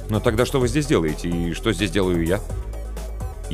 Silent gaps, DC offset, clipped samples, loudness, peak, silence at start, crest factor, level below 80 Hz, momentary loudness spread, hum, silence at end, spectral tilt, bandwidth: none; under 0.1%; under 0.1%; -22 LUFS; -4 dBFS; 0 s; 16 dB; -30 dBFS; 13 LU; none; 0 s; -5.5 dB/octave; 15.5 kHz